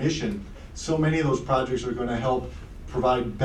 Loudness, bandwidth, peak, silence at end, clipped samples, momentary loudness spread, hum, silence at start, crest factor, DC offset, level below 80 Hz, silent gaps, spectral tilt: -26 LUFS; 10.5 kHz; -10 dBFS; 0 s; under 0.1%; 13 LU; none; 0 s; 16 dB; under 0.1%; -40 dBFS; none; -6 dB/octave